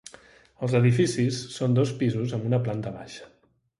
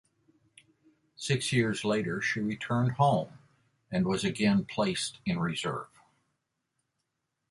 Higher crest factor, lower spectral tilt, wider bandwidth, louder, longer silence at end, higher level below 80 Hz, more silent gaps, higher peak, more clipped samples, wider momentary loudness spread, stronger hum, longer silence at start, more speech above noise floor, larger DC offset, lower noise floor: about the same, 18 dB vs 18 dB; about the same, -6.5 dB/octave vs -5.5 dB/octave; about the same, 11.5 kHz vs 11.5 kHz; first, -25 LUFS vs -30 LUFS; second, 0.55 s vs 1.65 s; about the same, -60 dBFS vs -62 dBFS; neither; first, -8 dBFS vs -14 dBFS; neither; first, 18 LU vs 9 LU; neither; second, 0.6 s vs 1.2 s; second, 28 dB vs 54 dB; neither; second, -53 dBFS vs -83 dBFS